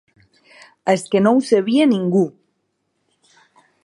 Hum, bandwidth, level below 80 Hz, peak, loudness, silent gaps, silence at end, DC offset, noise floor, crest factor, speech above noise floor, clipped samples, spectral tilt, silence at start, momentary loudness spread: none; 11.5 kHz; -70 dBFS; -2 dBFS; -17 LUFS; none; 1.55 s; under 0.1%; -71 dBFS; 18 dB; 55 dB; under 0.1%; -6.5 dB/octave; 0.85 s; 7 LU